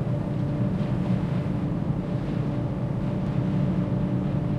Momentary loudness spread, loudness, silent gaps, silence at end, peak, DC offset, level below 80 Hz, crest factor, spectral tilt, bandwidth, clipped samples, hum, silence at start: 3 LU; -27 LUFS; none; 0 s; -14 dBFS; under 0.1%; -42 dBFS; 12 dB; -10 dB/octave; 6.8 kHz; under 0.1%; none; 0 s